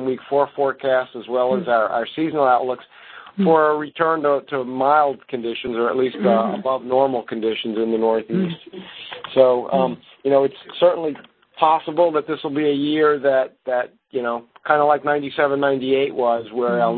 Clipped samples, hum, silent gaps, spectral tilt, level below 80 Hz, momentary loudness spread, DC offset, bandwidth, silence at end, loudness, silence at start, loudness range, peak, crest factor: under 0.1%; none; none; -10.5 dB/octave; -64 dBFS; 10 LU; under 0.1%; 4.5 kHz; 0 s; -20 LUFS; 0 s; 2 LU; 0 dBFS; 20 dB